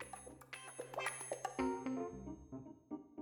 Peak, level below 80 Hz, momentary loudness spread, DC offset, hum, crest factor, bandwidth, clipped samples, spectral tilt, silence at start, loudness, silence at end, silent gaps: -24 dBFS; -66 dBFS; 12 LU; under 0.1%; none; 22 dB; 19 kHz; under 0.1%; -4 dB/octave; 0 s; -45 LUFS; 0 s; none